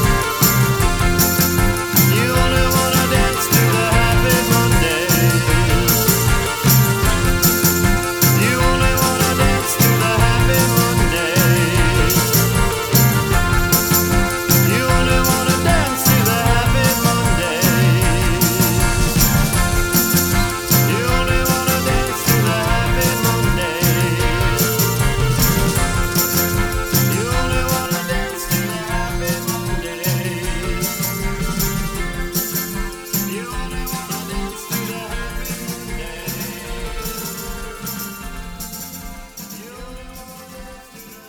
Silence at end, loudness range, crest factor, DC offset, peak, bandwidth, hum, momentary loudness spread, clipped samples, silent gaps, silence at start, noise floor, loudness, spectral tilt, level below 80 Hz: 0 s; 11 LU; 16 dB; under 0.1%; 0 dBFS; over 20 kHz; none; 13 LU; under 0.1%; none; 0 s; -39 dBFS; -16 LUFS; -4 dB/octave; -24 dBFS